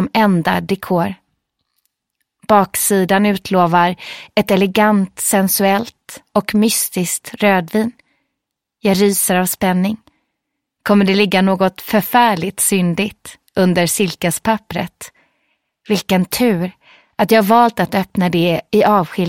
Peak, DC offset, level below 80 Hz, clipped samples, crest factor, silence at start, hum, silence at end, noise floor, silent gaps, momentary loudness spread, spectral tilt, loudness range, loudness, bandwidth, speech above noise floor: 0 dBFS; under 0.1%; -52 dBFS; under 0.1%; 16 dB; 0 s; none; 0 s; -78 dBFS; none; 10 LU; -4.5 dB/octave; 4 LU; -15 LUFS; 16.5 kHz; 63 dB